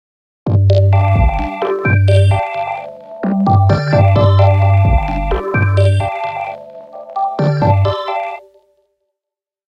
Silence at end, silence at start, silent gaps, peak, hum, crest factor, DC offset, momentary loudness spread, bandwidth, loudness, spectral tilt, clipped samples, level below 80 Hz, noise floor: 1.3 s; 0.45 s; none; 0 dBFS; none; 14 dB; under 0.1%; 15 LU; 8.6 kHz; -14 LUFS; -8.5 dB/octave; under 0.1%; -26 dBFS; -85 dBFS